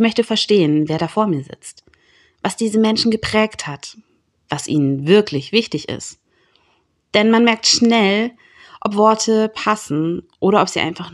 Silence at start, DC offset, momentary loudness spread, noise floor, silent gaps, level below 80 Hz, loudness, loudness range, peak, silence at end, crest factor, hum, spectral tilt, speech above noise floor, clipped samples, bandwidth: 0 s; under 0.1%; 15 LU; -62 dBFS; none; -54 dBFS; -17 LUFS; 5 LU; 0 dBFS; 0.05 s; 18 dB; none; -4.5 dB/octave; 45 dB; under 0.1%; 12 kHz